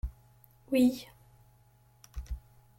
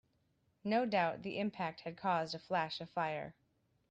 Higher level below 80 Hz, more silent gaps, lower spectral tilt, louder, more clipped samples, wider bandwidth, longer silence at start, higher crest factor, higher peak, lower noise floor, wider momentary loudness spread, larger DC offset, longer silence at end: first, -46 dBFS vs -78 dBFS; neither; about the same, -6 dB/octave vs -6 dB/octave; first, -30 LUFS vs -38 LUFS; neither; first, 16.5 kHz vs 8.8 kHz; second, 0.05 s vs 0.65 s; about the same, 20 dB vs 20 dB; first, -16 dBFS vs -20 dBFS; second, -63 dBFS vs -77 dBFS; first, 21 LU vs 8 LU; neither; second, 0.4 s vs 0.6 s